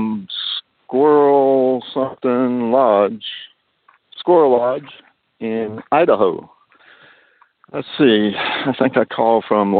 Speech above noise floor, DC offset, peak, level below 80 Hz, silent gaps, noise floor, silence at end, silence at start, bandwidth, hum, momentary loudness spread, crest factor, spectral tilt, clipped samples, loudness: 41 dB; under 0.1%; -2 dBFS; -64 dBFS; none; -57 dBFS; 0 s; 0 s; 4.7 kHz; none; 14 LU; 16 dB; -10 dB/octave; under 0.1%; -16 LUFS